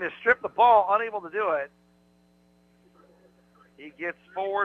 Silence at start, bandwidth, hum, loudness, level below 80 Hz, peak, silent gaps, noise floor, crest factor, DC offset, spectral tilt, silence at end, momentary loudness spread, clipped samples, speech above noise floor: 0 s; 6.8 kHz; 60 Hz at -65 dBFS; -24 LUFS; -70 dBFS; -8 dBFS; none; -62 dBFS; 20 dB; under 0.1%; -5.5 dB/octave; 0 s; 16 LU; under 0.1%; 37 dB